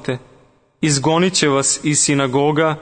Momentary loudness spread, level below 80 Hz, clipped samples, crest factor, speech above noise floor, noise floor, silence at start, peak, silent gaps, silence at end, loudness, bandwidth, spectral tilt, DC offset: 7 LU; -54 dBFS; under 0.1%; 14 dB; 36 dB; -52 dBFS; 0 s; -2 dBFS; none; 0 s; -16 LUFS; 9.6 kHz; -3.5 dB/octave; under 0.1%